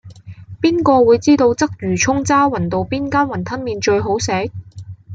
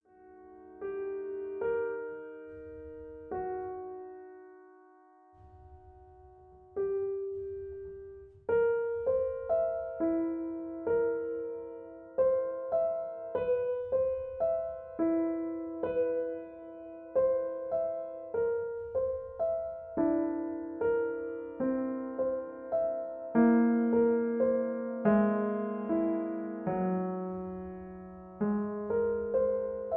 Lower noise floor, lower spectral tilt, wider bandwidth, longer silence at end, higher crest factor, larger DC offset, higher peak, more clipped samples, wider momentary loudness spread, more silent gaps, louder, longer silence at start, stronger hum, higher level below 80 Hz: second, -35 dBFS vs -60 dBFS; second, -5 dB/octave vs -11.5 dB/octave; first, 9.2 kHz vs 3.4 kHz; about the same, 0 s vs 0 s; about the same, 14 dB vs 18 dB; neither; first, -2 dBFS vs -14 dBFS; neither; second, 11 LU vs 16 LU; neither; first, -16 LUFS vs -32 LUFS; second, 0.05 s vs 0.2 s; neither; first, -48 dBFS vs -62 dBFS